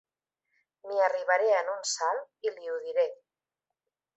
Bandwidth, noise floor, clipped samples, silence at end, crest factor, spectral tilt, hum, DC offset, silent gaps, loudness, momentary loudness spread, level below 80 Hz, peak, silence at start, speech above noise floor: 8.2 kHz; -89 dBFS; under 0.1%; 1 s; 20 dB; 1.5 dB/octave; none; under 0.1%; none; -29 LUFS; 10 LU; -88 dBFS; -12 dBFS; 0.85 s; 60 dB